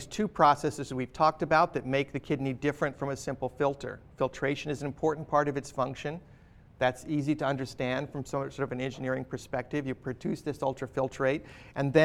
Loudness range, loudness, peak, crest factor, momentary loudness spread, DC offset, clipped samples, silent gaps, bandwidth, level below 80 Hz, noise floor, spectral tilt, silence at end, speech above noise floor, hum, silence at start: 5 LU; -31 LUFS; -8 dBFS; 22 dB; 10 LU; under 0.1%; under 0.1%; none; 14 kHz; -56 dBFS; -54 dBFS; -6 dB/octave; 0 s; 24 dB; none; 0 s